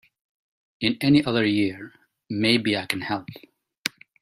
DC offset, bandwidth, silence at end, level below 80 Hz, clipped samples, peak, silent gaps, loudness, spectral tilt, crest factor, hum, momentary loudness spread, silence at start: under 0.1%; 15.5 kHz; 0.35 s; -60 dBFS; under 0.1%; 0 dBFS; 3.78-3.83 s; -23 LUFS; -5 dB/octave; 24 dB; none; 14 LU; 0.8 s